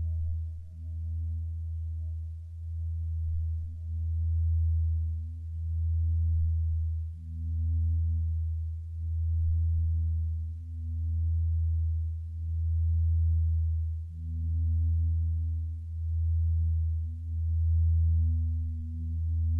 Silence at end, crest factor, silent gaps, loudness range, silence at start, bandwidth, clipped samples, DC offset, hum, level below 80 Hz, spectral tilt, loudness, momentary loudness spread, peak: 0 s; 8 dB; none; 4 LU; 0 s; 0.3 kHz; under 0.1%; under 0.1%; none; -32 dBFS; -11 dB/octave; -31 LUFS; 9 LU; -20 dBFS